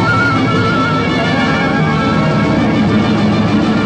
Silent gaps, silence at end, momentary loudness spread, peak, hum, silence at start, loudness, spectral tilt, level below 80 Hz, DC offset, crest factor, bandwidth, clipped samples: none; 0 s; 1 LU; -4 dBFS; none; 0 s; -13 LUFS; -6.5 dB/octave; -36 dBFS; under 0.1%; 8 dB; 9.2 kHz; under 0.1%